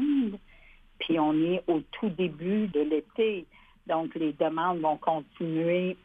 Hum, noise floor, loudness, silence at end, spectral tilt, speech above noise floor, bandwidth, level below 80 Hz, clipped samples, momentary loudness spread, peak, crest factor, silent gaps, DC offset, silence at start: none; -55 dBFS; -29 LUFS; 0.1 s; -9 dB/octave; 27 dB; 3.9 kHz; -60 dBFS; under 0.1%; 7 LU; -12 dBFS; 16 dB; none; under 0.1%; 0 s